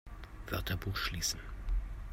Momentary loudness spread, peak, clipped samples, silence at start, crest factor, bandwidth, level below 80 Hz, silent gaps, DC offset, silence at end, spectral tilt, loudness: 10 LU; -22 dBFS; under 0.1%; 0.05 s; 16 dB; 16 kHz; -40 dBFS; none; under 0.1%; 0 s; -3 dB/octave; -38 LUFS